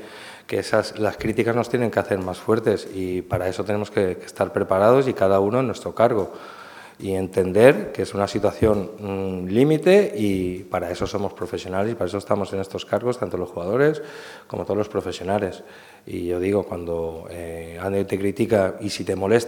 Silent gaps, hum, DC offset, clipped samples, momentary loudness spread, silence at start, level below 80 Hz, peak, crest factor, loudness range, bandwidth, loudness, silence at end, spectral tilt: none; none; under 0.1%; under 0.1%; 14 LU; 0 s; -52 dBFS; 0 dBFS; 22 dB; 6 LU; 18.5 kHz; -22 LUFS; 0 s; -6.5 dB/octave